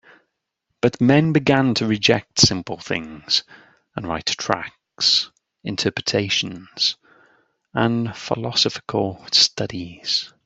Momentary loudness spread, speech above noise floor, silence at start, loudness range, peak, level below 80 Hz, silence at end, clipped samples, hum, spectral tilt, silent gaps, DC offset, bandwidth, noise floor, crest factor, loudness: 13 LU; 56 dB; 0.85 s; 4 LU; 0 dBFS; -54 dBFS; 0.2 s; under 0.1%; none; -4 dB/octave; none; under 0.1%; 8.2 kHz; -77 dBFS; 22 dB; -20 LUFS